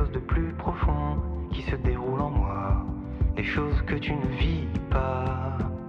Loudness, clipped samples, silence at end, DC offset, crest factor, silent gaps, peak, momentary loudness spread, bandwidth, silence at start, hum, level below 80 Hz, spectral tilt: -28 LUFS; under 0.1%; 0 s; under 0.1%; 14 dB; none; -14 dBFS; 4 LU; 6 kHz; 0 s; none; -30 dBFS; -9 dB/octave